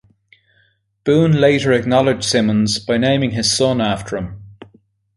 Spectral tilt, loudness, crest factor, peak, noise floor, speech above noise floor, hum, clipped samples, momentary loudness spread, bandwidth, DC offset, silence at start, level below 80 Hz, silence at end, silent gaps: -5 dB/octave; -16 LUFS; 16 dB; -2 dBFS; -60 dBFS; 44 dB; none; under 0.1%; 11 LU; 11.5 kHz; under 0.1%; 1.05 s; -46 dBFS; 0.65 s; none